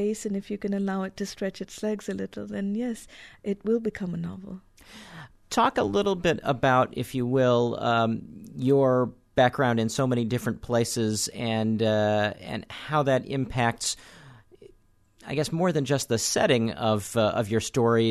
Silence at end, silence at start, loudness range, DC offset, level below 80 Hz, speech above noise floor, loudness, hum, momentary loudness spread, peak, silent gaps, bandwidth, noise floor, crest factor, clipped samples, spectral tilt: 0 s; 0 s; 7 LU; under 0.1%; -54 dBFS; 34 dB; -26 LUFS; none; 13 LU; -8 dBFS; none; 13.5 kHz; -60 dBFS; 18 dB; under 0.1%; -5 dB/octave